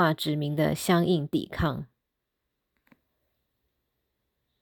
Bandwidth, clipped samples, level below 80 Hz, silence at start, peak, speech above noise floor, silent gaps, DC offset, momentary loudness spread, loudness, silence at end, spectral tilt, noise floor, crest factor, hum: 19.5 kHz; under 0.1%; -52 dBFS; 0 s; -10 dBFS; 56 dB; none; under 0.1%; 9 LU; -27 LUFS; 2.75 s; -6 dB/octave; -82 dBFS; 20 dB; none